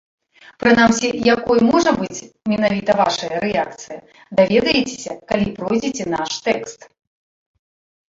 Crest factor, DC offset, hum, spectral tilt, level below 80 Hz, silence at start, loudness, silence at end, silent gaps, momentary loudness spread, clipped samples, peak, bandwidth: 18 dB; under 0.1%; none; -4.5 dB/octave; -50 dBFS; 0.6 s; -18 LUFS; 1.35 s; none; 13 LU; under 0.1%; -2 dBFS; 7.8 kHz